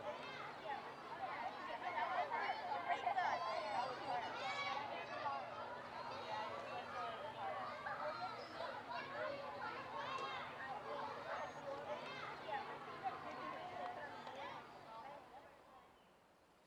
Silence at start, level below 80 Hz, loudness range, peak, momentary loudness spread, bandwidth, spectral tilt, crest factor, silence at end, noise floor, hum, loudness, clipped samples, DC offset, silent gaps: 0 s; -82 dBFS; 7 LU; -28 dBFS; 9 LU; 17 kHz; -4 dB/octave; 20 dB; 0 s; -70 dBFS; none; -46 LUFS; under 0.1%; under 0.1%; none